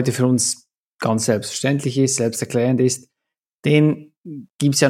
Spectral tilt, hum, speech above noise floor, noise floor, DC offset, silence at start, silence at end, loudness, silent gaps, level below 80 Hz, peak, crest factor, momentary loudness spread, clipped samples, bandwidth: -5 dB/octave; none; 65 dB; -83 dBFS; under 0.1%; 0 s; 0 s; -19 LUFS; 0.77-0.96 s, 3.54-3.63 s, 4.17-4.24 s, 4.50-4.59 s; -66 dBFS; -2 dBFS; 18 dB; 13 LU; under 0.1%; 16 kHz